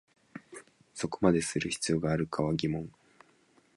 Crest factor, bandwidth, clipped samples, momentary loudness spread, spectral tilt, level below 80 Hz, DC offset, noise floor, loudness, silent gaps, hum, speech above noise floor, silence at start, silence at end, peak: 22 dB; 11.5 kHz; under 0.1%; 23 LU; -5 dB/octave; -56 dBFS; under 0.1%; -66 dBFS; -31 LUFS; none; none; 36 dB; 0.35 s; 0.85 s; -12 dBFS